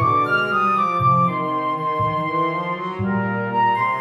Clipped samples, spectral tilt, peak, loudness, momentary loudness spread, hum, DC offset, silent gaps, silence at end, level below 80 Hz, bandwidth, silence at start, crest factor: under 0.1%; -7.5 dB/octave; -6 dBFS; -20 LUFS; 6 LU; none; under 0.1%; none; 0 s; -56 dBFS; 12 kHz; 0 s; 14 dB